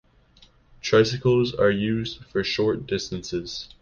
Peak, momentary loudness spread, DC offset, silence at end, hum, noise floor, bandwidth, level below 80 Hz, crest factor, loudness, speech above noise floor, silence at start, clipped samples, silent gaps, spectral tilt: -6 dBFS; 10 LU; under 0.1%; 0.15 s; none; -56 dBFS; 7.2 kHz; -50 dBFS; 18 dB; -24 LUFS; 33 dB; 0.85 s; under 0.1%; none; -5.5 dB/octave